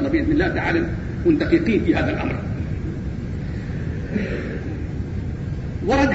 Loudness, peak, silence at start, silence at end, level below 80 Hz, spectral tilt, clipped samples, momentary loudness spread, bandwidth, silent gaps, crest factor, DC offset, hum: -23 LUFS; -4 dBFS; 0 s; 0 s; -32 dBFS; -8 dB/octave; under 0.1%; 10 LU; 8 kHz; none; 18 dB; 0.3%; none